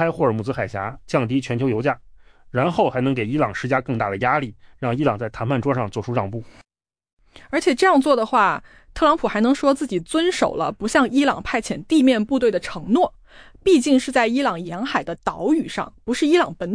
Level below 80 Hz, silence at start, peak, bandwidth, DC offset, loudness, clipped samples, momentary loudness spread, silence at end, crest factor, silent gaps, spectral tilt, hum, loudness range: -48 dBFS; 0 s; -6 dBFS; 10.5 kHz; under 0.1%; -20 LUFS; under 0.1%; 9 LU; 0 s; 16 dB; 7.13-7.17 s; -5.5 dB/octave; none; 4 LU